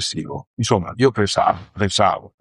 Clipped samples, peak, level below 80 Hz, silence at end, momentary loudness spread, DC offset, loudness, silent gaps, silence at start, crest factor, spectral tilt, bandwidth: under 0.1%; -2 dBFS; -48 dBFS; 0.15 s; 8 LU; under 0.1%; -19 LUFS; 0.47-0.57 s; 0 s; 18 dB; -4.5 dB/octave; 11.5 kHz